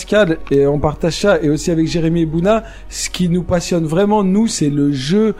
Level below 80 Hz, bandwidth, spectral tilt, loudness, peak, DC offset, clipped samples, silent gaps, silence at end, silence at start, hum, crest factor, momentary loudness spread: -34 dBFS; 15 kHz; -5.5 dB/octave; -15 LUFS; -2 dBFS; under 0.1%; under 0.1%; none; 0 s; 0 s; none; 14 dB; 4 LU